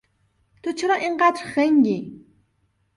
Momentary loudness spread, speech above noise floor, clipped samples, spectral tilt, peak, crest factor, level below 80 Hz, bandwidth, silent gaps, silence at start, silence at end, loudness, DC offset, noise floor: 13 LU; 47 dB; under 0.1%; -5 dB/octave; -6 dBFS; 16 dB; -66 dBFS; 11.5 kHz; none; 0.65 s; 0.8 s; -21 LUFS; under 0.1%; -68 dBFS